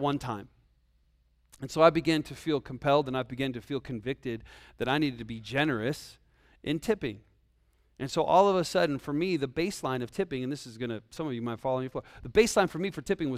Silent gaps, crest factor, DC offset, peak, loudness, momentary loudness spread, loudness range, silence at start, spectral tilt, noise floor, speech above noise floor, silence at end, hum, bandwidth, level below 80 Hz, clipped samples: none; 24 dB; under 0.1%; -6 dBFS; -29 LUFS; 15 LU; 4 LU; 0 s; -5.5 dB/octave; -68 dBFS; 38 dB; 0 s; none; 15.5 kHz; -56 dBFS; under 0.1%